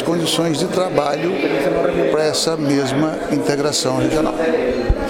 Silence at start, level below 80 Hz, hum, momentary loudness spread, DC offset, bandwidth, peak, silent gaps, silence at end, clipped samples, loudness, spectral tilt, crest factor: 0 s; -32 dBFS; none; 2 LU; under 0.1%; 17 kHz; 0 dBFS; none; 0 s; under 0.1%; -18 LUFS; -4.5 dB/octave; 18 dB